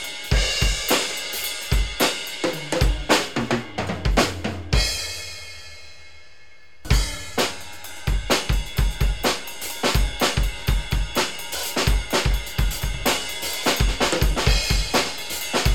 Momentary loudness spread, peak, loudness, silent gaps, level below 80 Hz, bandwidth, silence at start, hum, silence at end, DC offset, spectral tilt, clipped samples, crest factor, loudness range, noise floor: 8 LU; -4 dBFS; -23 LUFS; none; -26 dBFS; 19 kHz; 0 s; none; 0 s; 1%; -3.5 dB/octave; under 0.1%; 18 dB; 4 LU; -52 dBFS